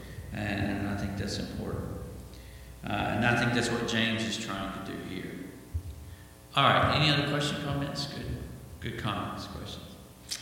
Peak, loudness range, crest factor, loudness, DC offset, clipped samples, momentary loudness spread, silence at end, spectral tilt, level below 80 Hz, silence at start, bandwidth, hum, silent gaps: -8 dBFS; 5 LU; 24 dB; -30 LUFS; under 0.1%; under 0.1%; 20 LU; 0 s; -4.5 dB/octave; -48 dBFS; 0 s; 17 kHz; none; none